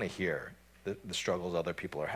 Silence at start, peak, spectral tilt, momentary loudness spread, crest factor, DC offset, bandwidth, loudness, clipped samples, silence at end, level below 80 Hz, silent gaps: 0 s; -20 dBFS; -4.5 dB/octave; 9 LU; 18 dB; under 0.1%; 16 kHz; -36 LUFS; under 0.1%; 0 s; -60 dBFS; none